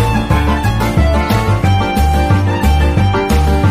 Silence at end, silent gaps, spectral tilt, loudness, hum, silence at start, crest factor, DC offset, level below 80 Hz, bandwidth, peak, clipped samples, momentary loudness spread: 0 s; none; -6.5 dB/octave; -13 LUFS; none; 0 s; 10 dB; under 0.1%; -18 dBFS; 15.5 kHz; -2 dBFS; under 0.1%; 2 LU